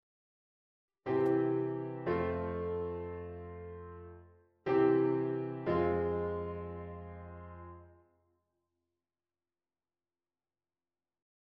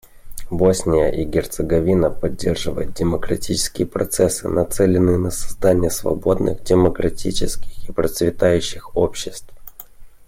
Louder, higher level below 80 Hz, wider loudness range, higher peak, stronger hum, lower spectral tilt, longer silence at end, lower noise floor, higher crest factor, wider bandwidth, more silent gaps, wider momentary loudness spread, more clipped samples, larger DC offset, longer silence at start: second, -34 LUFS vs -19 LUFS; second, -60 dBFS vs -34 dBFS; first, 16 LU vs 2 LU; second, -18 dBFS vs -4 dBFS; neither; first, -10 dB/octave vs -5.5 dB/octave; first, 3.55 s vs 0.05 s; first, under -90 dBFS vs -38 dBFS; about the same, 18 dB vs 16 dB; second, 5.4 kHz vs 16.5 kHz; neither; first, 19 LU vs 11 LU; neither; neither; first, 1.05 s vs 0.15 s